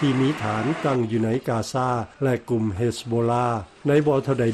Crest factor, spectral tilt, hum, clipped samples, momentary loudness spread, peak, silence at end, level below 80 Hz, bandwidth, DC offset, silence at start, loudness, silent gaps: 14 dB; -7 dB/octave; none; under 0.1%; 5 LU; -8 dBFS; 0 s; -54 dBFS; 13 kHz; under 0.1%; 0 s; -23 LUFS; none